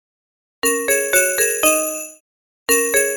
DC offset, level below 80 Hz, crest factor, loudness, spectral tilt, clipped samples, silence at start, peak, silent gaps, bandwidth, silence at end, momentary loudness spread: under 0.1%; -54 dBFS; 18 dB; -16 LUFS; 0 dB/octave; under 0.1%; 0.65 s; -2 dBFS; 2.20-2.66 s; over 20 kHz; 0 s; 13 LU